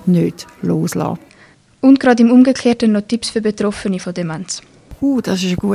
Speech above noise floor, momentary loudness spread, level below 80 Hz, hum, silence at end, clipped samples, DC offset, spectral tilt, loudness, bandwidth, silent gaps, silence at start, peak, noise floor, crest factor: 33 dB; 13 LU; -46 dBFS; none; 0 s; under 0.1%; under 0.1%; -6 dB/octave; -15 LUFS; 14.5 kHz; none; 0.05 s; 0 dBFS; -47 dBFS; 16 dB